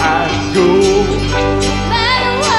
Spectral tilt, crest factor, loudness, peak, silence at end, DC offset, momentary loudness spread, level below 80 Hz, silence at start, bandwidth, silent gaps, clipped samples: -4.5 dB/octave; 12 dB; -13 LUFS; -2 dBFS; 0 s; under 0.1%; 4 LU; -26 dBFS; 0 s; 12 kHz; none; under 0.1%